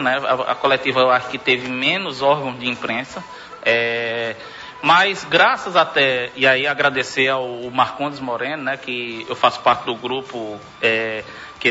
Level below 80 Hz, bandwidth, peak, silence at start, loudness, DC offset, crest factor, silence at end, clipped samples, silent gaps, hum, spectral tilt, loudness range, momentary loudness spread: -60 dBFS; 8 kHz; -2 dBFS; 0 s; -18 LUFS; under 0.1%; 18 dB; 0 s; under 0.1%; none; none; -4 dB/octave; 5 LU; 11 LU